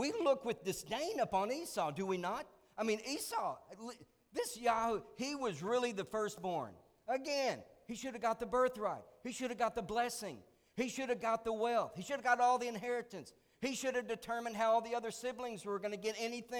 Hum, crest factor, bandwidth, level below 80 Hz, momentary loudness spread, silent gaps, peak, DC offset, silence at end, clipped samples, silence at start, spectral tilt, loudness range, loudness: none; 20 dB; over 20 kHz; -70 dBFS; 12 LU; none; -18 dBFS; under 0.1%; 0 s; under 0.1%; 0 s; -3.5 dB/octave; 3 LU; -38 LUFS